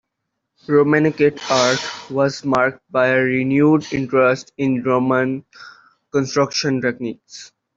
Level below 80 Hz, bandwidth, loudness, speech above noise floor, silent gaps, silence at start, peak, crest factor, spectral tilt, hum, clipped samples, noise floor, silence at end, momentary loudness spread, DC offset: -58 dBFS; 7.8 kHz; -18 LUFS; 59 dB; none; 0.7 s; -2 dBFS; 16 dB; -5 dB/octave; none; under 0.1%; -77 dBFS; 0.3 s; 9 LU; under 0.1%